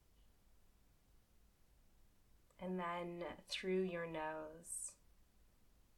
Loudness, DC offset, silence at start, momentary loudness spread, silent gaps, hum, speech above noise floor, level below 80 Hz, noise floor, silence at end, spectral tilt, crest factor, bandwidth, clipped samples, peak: -45 LUFS; under 0.1%; 0.2 s; 10 LU; none; none; 26 dB; -72 dBFS; -71 dBFS; 0.3 s; -4 dB/octave; 18 dB; 18 kHz; under 0.1%; -30 dBFS